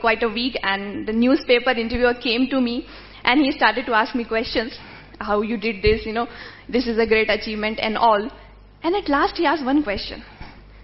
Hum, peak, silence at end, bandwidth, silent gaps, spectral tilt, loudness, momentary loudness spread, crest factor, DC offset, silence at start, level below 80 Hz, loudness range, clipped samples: 50 Hz at -50 dBFS; 0 dBFS; 0 s; 6 kHz; none; -8 dB/octave; -20 LUFS; 13 LU; 22 dB; under 0.1%; 0 s; -42 dBFS; 3 LU; under 0.1%